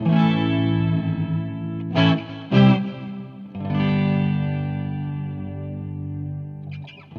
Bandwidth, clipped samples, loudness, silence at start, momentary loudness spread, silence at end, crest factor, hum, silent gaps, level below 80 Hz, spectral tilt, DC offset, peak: 6.4 kHz; under 0.1%; -22 LUFS; 0 s; 16 LU; 0 s; 18 dB; none; none; -54 dBFS; -9 dB/octave; under 0.1%; -4 dBFS